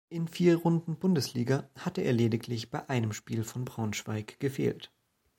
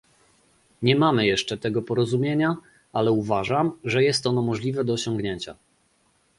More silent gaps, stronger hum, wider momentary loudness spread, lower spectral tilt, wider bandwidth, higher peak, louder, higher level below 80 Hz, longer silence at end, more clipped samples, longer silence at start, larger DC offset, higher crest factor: neither; neither; about the same, 10 LU vs 9 LU; about the same, -6.5 dB/octave vs -5.5 dB/octave; first, 16.5 kHz vs 11.5 kHz; second, -12 dBFS vs -4 dBFS; second, -31 LUFS vs -24 LUFS; second, -66 dBFS vs -58 dBFS; second, 0.5 s vs 0.85 s; neither; second, 0.1 s vs 0.8 s; neither; about the same, 18 dB vs 20 dB